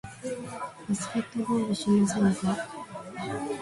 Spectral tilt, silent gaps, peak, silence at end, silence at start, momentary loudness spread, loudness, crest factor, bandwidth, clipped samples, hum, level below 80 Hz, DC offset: -5.5 dB/octave; none; -14 dBFS; 0 s; 0.05 s; 14 LU; -29 LUFS; 16 dB; 11.5 kHz; under 0.1%; none; -60 dBFS; under 0.1%